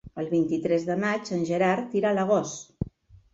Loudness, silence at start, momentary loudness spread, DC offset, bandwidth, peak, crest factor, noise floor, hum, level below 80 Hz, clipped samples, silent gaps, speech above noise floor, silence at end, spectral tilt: -26 LUFS; 0.05 s; 12 LU; under 0.1%; 8 kHz; -10 dBFS; 16 dB; -50 dBFS; none; -54 dBFS; under 0.1%; none; 24 dB; 0.5 s; -6 dB/octave